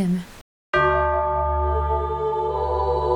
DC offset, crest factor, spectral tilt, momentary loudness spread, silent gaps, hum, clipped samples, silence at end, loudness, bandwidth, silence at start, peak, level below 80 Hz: under 0.1%; 14 dB; -7.5 dB/octave; 5 LU; 0.41-0.73 s; none; under 0.1%; 0 s; -22 LUFS; 11 kHz; 0 s; -8 dBFS; -30 dBFS